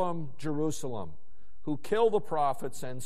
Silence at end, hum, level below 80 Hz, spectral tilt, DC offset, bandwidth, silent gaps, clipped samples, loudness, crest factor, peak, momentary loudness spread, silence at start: 0 s; none; -62 dBFS; -6 dB/octave; 3%; 14 kHz; none; under 0.1%; -32 LUFS; 18 dB; -14 dBFS; 14 LU; 0 s